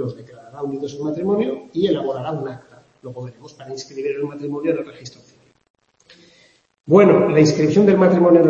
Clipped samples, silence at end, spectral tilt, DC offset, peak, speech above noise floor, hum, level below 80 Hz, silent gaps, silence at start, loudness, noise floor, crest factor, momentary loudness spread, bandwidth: under 0.1%; 0 s; -7 dB/octave; under 0.1%; 0 dBFS; 36 dB; none; -60 dBFS; 5.70-5.74 s; 0 s; -18 LUFS; -54 dBFS; 18 dB; 22 LU; 7.6 kHz